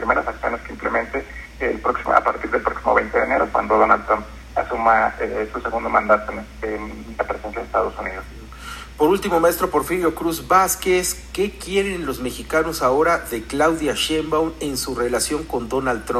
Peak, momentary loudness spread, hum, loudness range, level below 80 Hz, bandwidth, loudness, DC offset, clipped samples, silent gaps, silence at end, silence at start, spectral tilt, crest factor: 0 dBFS; 11 LU; none; 4 LU; -40 dBFS; 15 kHz; -20 LUFS; under 0.1%; under 0.1%; none; 0 s; 0 s; -3.5 dB/octave; 20 dB